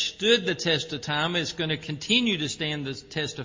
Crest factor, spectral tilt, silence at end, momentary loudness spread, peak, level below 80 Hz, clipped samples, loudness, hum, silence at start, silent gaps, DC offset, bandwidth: 20 dB; -3.5 dB/octave; 0 s; 9 LU; -6 dBFS; -58 dBFS; under 0.1%; -25 LUFS; none; 0 s; none; under 0.1%; 7.6 kHz